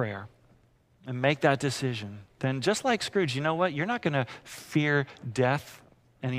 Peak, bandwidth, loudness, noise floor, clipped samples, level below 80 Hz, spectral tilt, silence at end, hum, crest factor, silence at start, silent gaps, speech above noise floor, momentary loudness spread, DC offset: -8 dBFS; 15.5 kHz; -28 LUFS; -63 dBFS; under 0.1%; -66 dBFS; -5.5 dB/octave; 0 s; none; 22 dB; 0 s; none; 35 dB; 13 LU; under 0.1%